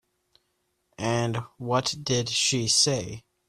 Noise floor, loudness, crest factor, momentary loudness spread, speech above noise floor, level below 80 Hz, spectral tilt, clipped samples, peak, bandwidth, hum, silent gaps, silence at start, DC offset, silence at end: -75 dBFS; -25 LUFS; 20 dB; 12 LU; 48 dB; -58 dBFS; -3 dB/octave; under 0.1%; -8 dBFS; 14 kHz; none; none; 1 s; under 0.1%; 0.3 s